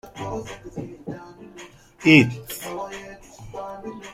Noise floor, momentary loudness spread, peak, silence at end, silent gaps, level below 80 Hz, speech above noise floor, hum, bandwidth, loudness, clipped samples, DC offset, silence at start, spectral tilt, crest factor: -45 dBFS; 27 LU; -2 dBFS; 0 s; none; -54 dBFS; 25 dB; none; 16 kHz; -20 LUFS; under 0.1%; under 0.1%; 0.05 s; -5.5 dB/octave; 22 dB